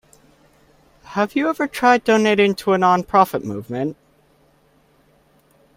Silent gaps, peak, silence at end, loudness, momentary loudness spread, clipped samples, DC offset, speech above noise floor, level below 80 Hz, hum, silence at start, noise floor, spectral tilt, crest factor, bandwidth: none; 0 dBFS; 1.85 s; -18 LUFS; 12 LU; under 0.1%; under 0.1%; 40 dB; -58 dBFS; none; 1.1 s; -57 dBFS; -5.5 dB/octave; 20 dB; 16 kHz